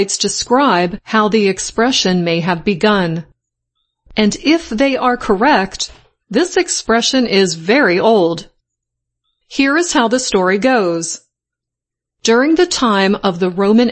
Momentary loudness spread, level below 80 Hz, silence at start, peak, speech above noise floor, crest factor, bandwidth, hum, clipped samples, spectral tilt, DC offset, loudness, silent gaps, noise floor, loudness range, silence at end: 8 LU; -46 dBFS; 0 s; 0 dBFS; 70 dB; 14 dB; 8.8 kHz; none; under 0.1%; -4 dB/octave; under 0.1%; -14 LUFS; none; -83 dBFS; 2 LU; 0 s